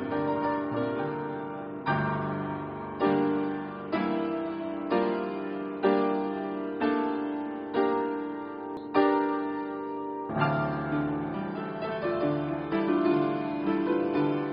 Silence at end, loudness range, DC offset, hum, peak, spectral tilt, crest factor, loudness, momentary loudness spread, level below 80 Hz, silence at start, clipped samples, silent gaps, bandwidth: 0 s; 2 LU; under 0.1%; none; -12 dBFS; -6 dB/octave; 18 dB; -30 LUFS; 9 LU; -62 dBFS; 0 s; under 0.1%; none; 5.2 kHz